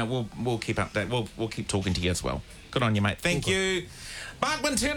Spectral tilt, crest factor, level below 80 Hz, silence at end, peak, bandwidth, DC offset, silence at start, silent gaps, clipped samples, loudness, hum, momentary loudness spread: -4.5 dB/octave; 18 dB; -46 dBFS; 0 s; -10 dBFS; 19 kHz; under 0.1%; 0 s; none; under 0.1%; -28 LUFS; none; 8 LU